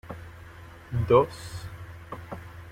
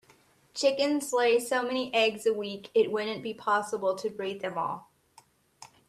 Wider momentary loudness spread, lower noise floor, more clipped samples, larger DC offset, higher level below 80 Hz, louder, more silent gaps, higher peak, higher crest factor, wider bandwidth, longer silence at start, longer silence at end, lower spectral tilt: first, 24 LU vs 9 LU; second, -46 dBFS vs -62 dBFS; neither; neither; first, -52 dBFS vs -76 dBFS; first, -25 LUFS vs -28 LUFS; neither; first, -6 dBFS vs -12 dBFS; about the same, 22 dB vs 18 dB; first, 16 kHz vs 14 kHz; second, 0.05 s vs 0.55 s; second, 0 s vs 0.2 s; first, -7 dB/octave vs -3 dB/octave